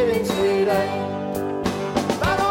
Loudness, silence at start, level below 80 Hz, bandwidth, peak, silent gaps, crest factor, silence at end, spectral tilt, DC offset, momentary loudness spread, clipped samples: -22 LUFS; 0 s; -44 dBFS; 16.5 kHz; -6 dBFS; none; 16 dB; 0 s; -5.5 dB/octave; under 0.1%; 6 LU; under 0.1%